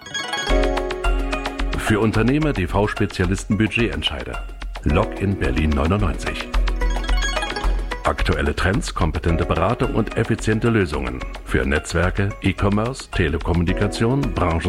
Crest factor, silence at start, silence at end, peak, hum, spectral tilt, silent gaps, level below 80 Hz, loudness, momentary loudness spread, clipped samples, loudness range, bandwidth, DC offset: 16 dB; 0 s; 0 s; -4 dBFS; none; -6 dB/octave; none; -26 dBFS; -21 LUFS; 6 LU; under 0.1%; 2 LU; 13 kHz; under 0.1%